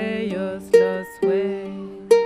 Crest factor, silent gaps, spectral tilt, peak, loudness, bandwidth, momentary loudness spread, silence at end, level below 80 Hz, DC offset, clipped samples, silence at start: 18 dB; none; -6 dB/octave; -2 dBFS; -21 LUFS; 15 kHz; 13 LU; 0 s; -60 dBFS; under 0.1%; under 0.1%; 0 s